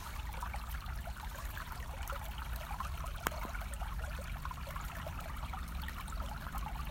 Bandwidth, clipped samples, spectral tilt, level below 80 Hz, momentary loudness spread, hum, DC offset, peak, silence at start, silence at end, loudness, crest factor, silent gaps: 17 kHz; under 0.1%; -4.5 dB/octave; -44 dBFS; 4 LU; none; under 0.1%; -12 dBFS; 0 s; 0 s; -43 LUFS; 30 dB; none